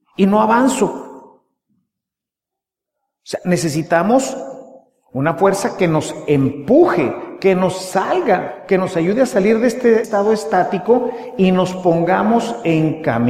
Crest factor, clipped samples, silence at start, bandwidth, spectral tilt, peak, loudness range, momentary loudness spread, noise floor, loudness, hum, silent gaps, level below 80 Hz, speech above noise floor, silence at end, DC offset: 16 dB; under 0.1%; 0.2 s; 15 kHz; -6 dB/octave; 0 dBFS; 5 LU; 7 LU; -86 dBFS; -16 LUFS; none; none; -54 dBFS; 70 dB; 0 s; under 0.1%